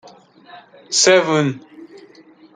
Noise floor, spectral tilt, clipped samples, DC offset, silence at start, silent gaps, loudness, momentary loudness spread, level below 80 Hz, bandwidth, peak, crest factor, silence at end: -47 dBFS; -3 dB/octave; under 0.1%; under 0.1%; 0.55 s; none; -15 LUFS; 12 LU; -68 dBFS; 9.6 kHz; -2 dBFS; 18 dB; 0.7 s